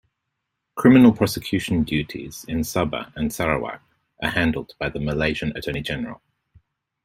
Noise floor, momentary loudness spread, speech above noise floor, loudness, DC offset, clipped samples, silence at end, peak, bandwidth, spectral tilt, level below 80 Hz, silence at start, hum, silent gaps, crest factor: -79 dBFS; 16 LU; 58 dB; -22 LUFS; under 0.1%; under 0.1%; 0.9 s; -2 dBFS; 16 kHz; -6 dB/octave; -44 dBFS; 0.75 s; none; none; 20 dB